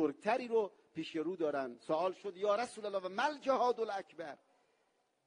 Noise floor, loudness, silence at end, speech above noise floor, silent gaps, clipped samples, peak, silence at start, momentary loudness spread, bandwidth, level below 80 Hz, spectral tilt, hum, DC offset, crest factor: -78 dBFS; -37 LUFS; 0.9 s; 41 dB; none; under 0.1%; -18 dBFS; 0 s; 12 LU; 10 kHz; -86 dBFS; -4.5 dB/octave; none; under 0.1%; 18 dB